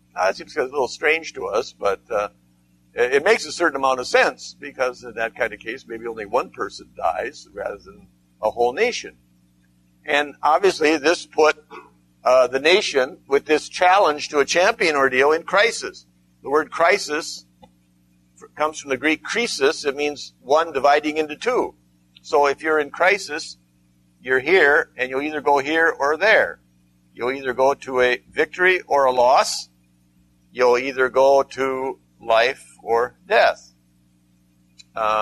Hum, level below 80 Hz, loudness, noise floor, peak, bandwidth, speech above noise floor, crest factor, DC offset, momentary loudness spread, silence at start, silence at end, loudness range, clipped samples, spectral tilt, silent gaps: 60 Hz at -50 dBFS; -58 dBFS; -20 LUFS; -59 dBFS; -2 dBFS; 13.5 kHz; 39 dB; 20 dB; under 0.1%; 14 LU; 0.15 s; 0 s; 7 LU; under 0.1%; -2.5 dB/octave; none